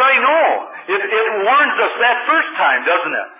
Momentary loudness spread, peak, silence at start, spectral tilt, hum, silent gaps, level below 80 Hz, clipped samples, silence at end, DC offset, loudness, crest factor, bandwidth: 5 LU; -4 dBFS; 0 s; -5 dB/octave; none; none; under -90 dBFS; under 0.1%; 0.05 s; under 0.1%; -14 LUFS; 12 dB; 3.8 kHz